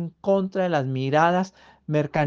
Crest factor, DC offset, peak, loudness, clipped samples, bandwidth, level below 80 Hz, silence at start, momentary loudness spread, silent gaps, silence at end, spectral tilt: 18 dB; under 0.1%; -6 dBFS; -23 LUFS; under 0.1%; 7.4 kHz; -64 dBFS; 0 s; 8 LU; none; 0 s; -7 dB/octave